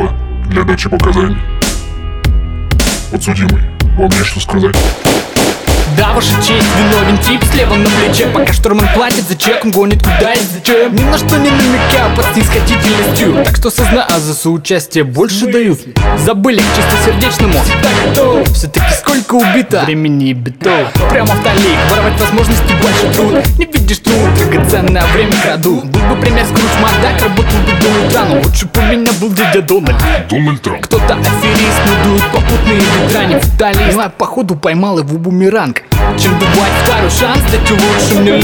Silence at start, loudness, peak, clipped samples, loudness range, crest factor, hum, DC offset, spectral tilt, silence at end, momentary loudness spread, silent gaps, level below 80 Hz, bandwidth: 0 s; -10 LUFS; 0 dBFS; under 0.1%; 2 LU; 10 dB; none; under 0.1%; -5 dB/octave; 0 s; 4 LU; none; -16 dBFS; over 20 kHz